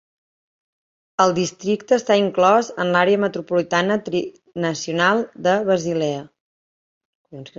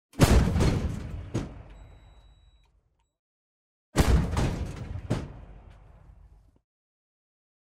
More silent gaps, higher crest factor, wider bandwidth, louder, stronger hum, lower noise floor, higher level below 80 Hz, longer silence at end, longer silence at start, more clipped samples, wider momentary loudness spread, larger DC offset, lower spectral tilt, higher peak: first, 6.40-7.25 s vs 3.19-3.93 s; about the same, 20 dB vs 22 dB; second, 7.8 kHz vs 16 kHz; first, -19 LUFS vs -27 LUFS; neither; first, under -90 dBFS vs -69 dBFS; second, -64 dBFS vs -34 dBFS; second, 0.1 s vs 2 s; first, 1.2 s vs 0.15 s; neither; second, 9 LU vs 19 LU; neither; about the same, -5 dB/octave vs -6 dB/octave; first, -2 dBFS vs -8 dBFS